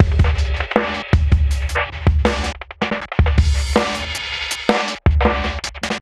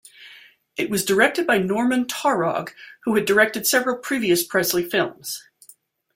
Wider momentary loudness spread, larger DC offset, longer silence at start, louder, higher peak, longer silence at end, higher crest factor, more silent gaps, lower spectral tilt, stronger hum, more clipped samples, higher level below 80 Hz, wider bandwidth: second, 7 LU vs 13 LU; neither; second, 0 s vs 0.2 s; about the same, -19 LUFS vs -20 LUFS; about the same, 0 dBFS vs -2 dBFS; second, 0 s vs 0.75 s; about the same, 18 dB vs 20 dB; neither; first, -5.5 dB/octave vs -3.5 dB/octave; neither; neither; first, -20 dBFS vs -62 dBFS; second, 12.5 kHz vs 16.5 kHz